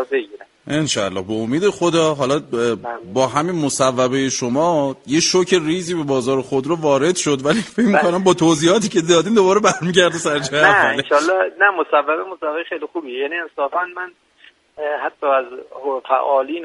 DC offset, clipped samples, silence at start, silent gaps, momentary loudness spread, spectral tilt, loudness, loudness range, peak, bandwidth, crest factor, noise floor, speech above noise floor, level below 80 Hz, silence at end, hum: under 0.1%; under 0.1%; 0 s; none; 10 LU; -4 dB/octave; -17 LUFS; 8 LU; 0 dBFS; 11.5 kHz; 18 dB; -51 dBFS; 34 dB; -58 dBFS; 0 s; none